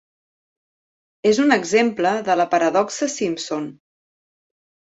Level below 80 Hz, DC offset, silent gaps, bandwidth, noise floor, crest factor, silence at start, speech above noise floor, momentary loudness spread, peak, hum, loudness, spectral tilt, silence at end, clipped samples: -66 dBFS; under 0.1%; none; 8.2 kHz; under -90 dBFS; 20 dB; 1.25 s; over 71 dB; 10 LU; -2 dBFS; none; -19 LUFS; -4 dB/octave; 1.2 s; under 0.1%